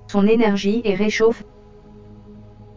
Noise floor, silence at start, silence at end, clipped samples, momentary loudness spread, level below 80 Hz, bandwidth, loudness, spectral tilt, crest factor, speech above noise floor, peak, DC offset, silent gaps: -43 dBFS; 0 s; 0 s; under 0.1%; 4 LU; -48 dBFS; 7.6 kHz; -18 LUFS; -6 dB/octave; 16 dB; 26 dB; -4 dBFS; under 0.1%; none